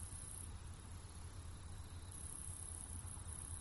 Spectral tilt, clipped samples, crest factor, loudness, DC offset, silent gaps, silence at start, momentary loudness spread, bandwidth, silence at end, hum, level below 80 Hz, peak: -3.5 dB/octave; under 0.1%; 16 dB; -51 LUFS; under 0.1%; none; 0 s; 6 LU; 11.5 kHz; 0 s; none; -56 dBFS; -34 dBFS